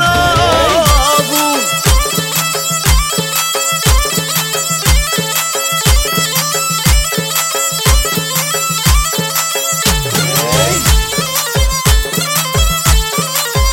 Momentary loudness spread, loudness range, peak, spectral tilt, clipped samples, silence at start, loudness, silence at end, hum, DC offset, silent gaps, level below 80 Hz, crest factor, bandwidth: 3 LU; 1 LU; 0 dBFS; -2.5 dB/octave; under 0.1%; 0 s; -12 LUFS; 0 s; none; under 0.1%; none; -18 dBFS; 12 dB; 17 kHz